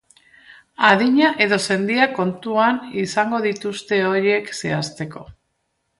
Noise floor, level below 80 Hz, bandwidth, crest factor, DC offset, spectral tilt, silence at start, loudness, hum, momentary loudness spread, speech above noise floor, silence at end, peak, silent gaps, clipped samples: -72 dBFS; -60 dBFS; 11.5 kHz; 20 dB; under 0.1%; -4.5 dB/octave; 0.8 s; -19 LUFS; none; 11 LU; 53 dB; 0.7 s; 0 dBFS; none; under 0.1%